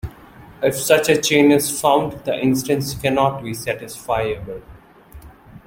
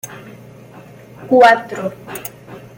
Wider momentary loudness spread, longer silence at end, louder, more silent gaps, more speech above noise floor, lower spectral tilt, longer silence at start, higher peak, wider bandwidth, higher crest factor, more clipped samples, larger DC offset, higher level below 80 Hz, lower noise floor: second, 13 LU vs 27 LU; about the same, 0.1 s vs 0.2 s; second, -18 LUFS vs -13 LUFS; neither; about the same, 25 dB vs 26 dB; about the same, -4 dB/octave vs -4.5 dB/octave; about the same, 0.05 s vs 0.05 s; about the same, -2 dBFS vs 0 dBFS; about the same, 17 kHz vs 17 kHz; about the same, 18 dB vs 18 dB; neither; neither; first, -46 dBFS vs -58 dBFS; first, -43 dBFS vs -39 dBFS